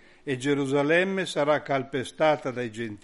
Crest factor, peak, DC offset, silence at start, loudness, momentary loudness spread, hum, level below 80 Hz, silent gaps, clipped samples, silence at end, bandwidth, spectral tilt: 18 dB; -8 dBFS; under 0.1%; 0.25 s; -26 LUFS; 10 LU; none; -62 dBFS; none; under 0.1%; 0.05 s; 11.5 kHz; -5.5 dB/octave